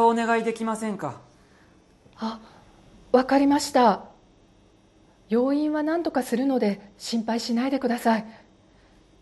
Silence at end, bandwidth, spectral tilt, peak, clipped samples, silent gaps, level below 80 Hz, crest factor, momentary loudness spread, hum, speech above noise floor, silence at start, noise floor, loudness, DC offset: 0.85 s; 12.5 kHz; -5 dB/octave; -6 dBFS; under 0.1%; none; -62 dBFS; 20 dB; 13 LU; none; 34 dB; 0 s; -57 dBFS; -24 LUFS; under 0.1%